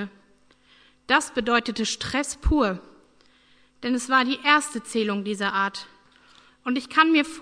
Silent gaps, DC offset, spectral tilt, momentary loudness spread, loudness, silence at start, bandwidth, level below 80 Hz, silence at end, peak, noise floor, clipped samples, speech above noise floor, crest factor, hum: none; under 0.1%; -3.5 dB/octave; 9 LU; -23 LUFS; 0 s; 11 kHz; -40 dBFS; 0 s; -4 dBFS; -59 dBFS; under 0.1%; 35 dB; 22 dB; none